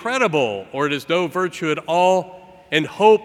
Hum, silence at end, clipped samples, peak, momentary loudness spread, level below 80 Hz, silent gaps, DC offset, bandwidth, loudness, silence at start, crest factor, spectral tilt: none; 0 s; under 0.1%; -2 dBFS; 7 LU; -64 dBFS; none; under 0.1%; 14.5 kHz; -20 LUFS; 0 s; 18 dB; -4.5 dB/octave